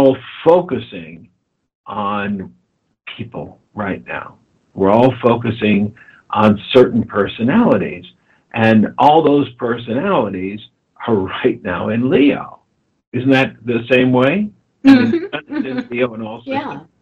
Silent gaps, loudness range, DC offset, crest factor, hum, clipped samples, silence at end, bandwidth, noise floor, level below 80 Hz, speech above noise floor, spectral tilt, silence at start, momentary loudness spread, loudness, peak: 1.75-1.84 s, 13.07-13.12 s; 8 LU; under 0.1%; 16 dB; none; under 0.1%; 0.2 s; 7 kHz; -62 dBFS; -52 dBFS; 47 dB; -8 dB/octave; 0 s; 17 LU; -15 LUFS; 0 dBFS